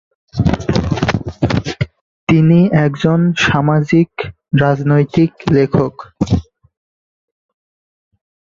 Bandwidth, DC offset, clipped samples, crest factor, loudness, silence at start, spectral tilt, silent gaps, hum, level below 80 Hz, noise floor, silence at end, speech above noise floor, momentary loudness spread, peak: 7.4 kHz; under 0.1%; under 0.1%; 14 dB; -14 LUFS; 0.35 s; -7.5 dB/octave; 2.01-2.27 s; none; -34 dBFS; under -90 dBFS; 2.05 s; over 77 dB; 11 LU; 0 dBFS